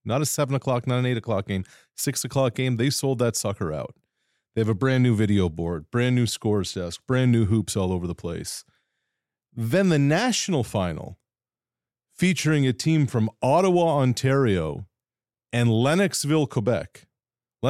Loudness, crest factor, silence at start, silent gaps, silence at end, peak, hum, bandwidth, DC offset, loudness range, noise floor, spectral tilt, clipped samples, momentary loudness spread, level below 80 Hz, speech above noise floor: -23 LUFS; 16 dB; 0.05 s; none; 0 s; -8 dBFS; none; 15.5 kHz; under 0.1%; 3 LU; under -90 dBFS; -5.5 dB/octave; under 0.1%; 11 LU; -56 dBFS; over 67 dB